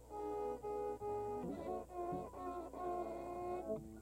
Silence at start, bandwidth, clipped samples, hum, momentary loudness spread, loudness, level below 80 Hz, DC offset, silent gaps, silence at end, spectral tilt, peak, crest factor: 0 s; 16 kHz; under 0.1%; 60 Hz at -60 dBFS; 3 LU; -45 LUFS; -62 dBFS; under 0.1%; none; 0 s; -7.5 dB/octave; -32 dBFS; 12 dB